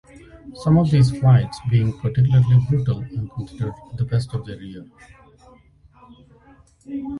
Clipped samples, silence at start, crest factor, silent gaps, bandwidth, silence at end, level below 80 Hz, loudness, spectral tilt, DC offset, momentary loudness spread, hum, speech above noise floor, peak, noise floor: under 0.1%; 0.45 s; 16 dB; none; 11 kHz; 0 s; -44 dBFS; -20 LUFS; -8.5 dB/octave; under 0.1%; 18 LU; none; 33 dB; -4 dBFS; -52 dBFS